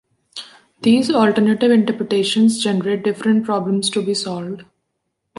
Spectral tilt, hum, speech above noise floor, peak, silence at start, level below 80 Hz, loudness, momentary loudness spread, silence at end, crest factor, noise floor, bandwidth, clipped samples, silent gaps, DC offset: -5 dB/octave; none; 58 dB; -2 dBFS; 0.35 s; -64 dBFS; -17 LUFS; 18 LU; 0.75 s; 16 dB; -74 dBFS; 11.5 kHz; under 0.1%; none; under 0.1%